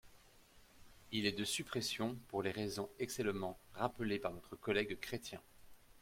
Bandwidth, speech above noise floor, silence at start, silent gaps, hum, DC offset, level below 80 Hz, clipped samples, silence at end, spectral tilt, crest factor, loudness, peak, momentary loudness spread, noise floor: 16.5 kHz; 24 dB; 0.05 s; none; none; under 0.1%; -68 dBFS; under 0.1%; 0 s; -4 dB/octave; 22 dB; -41 LUFS; -20 dBFS; 8 LU; -65 dBFS